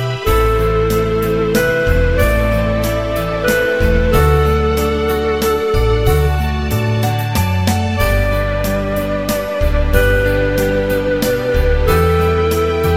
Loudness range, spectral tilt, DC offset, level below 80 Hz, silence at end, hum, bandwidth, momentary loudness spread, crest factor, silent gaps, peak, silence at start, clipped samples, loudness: 2 LU; -6 dB/octave; 0.6%; -20 dBFS; 0 s; none; 16.5 kHz; 4 LU; 14 dB; none; 0 dBFS; 0 s; under 0.1%; -15 LUFS